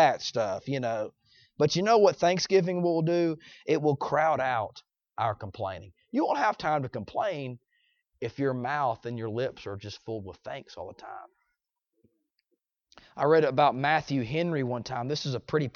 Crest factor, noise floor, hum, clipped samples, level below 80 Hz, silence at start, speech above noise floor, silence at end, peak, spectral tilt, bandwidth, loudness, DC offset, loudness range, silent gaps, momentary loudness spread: 20 dB; -82 dBFS; none; under 0.1%; -66 dBFS; 0 s; 54 dB; 0.05 s; -10 dBFS; -5.5 dB/octave; 7.2 kHz; -28 LUFS; under 0.1%; 13 LU; none; 17 LU